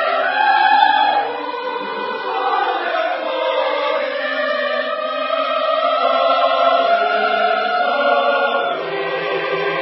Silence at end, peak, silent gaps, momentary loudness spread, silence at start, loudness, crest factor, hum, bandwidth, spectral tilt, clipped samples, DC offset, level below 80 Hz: 0 s; 0 dBFS; none; 8 LU; 0 s; -17 LUFS; 18 dB; none; 5.8 kHz; -6.5 dB/octave; under 0.1%; under 0.1%; -76 dBFS